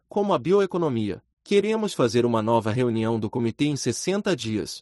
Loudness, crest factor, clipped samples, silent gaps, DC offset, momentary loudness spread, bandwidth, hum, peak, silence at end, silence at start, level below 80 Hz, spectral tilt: -24 LUFS; 16 dB; under 0.1%; 1.33-1.37 s; under 0.1%; 6 LU; 12 kHz; none; -8 dBFS; 0 s; 0.15 s; -60 dBFS; -5.5 dB/octave